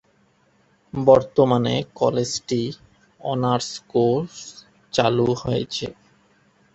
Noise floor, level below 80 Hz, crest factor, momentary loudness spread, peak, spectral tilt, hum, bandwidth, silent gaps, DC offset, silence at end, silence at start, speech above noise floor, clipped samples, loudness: -61 dBFS; -54 dBFS; 22 dB; 17 LU; 0 dBFS; -5.5 dB/octave; none; 8.2 kHz; none; under 0.1%; 0.85 s; 0.95 s; 40 dB; under 0.1%; -21 LUFS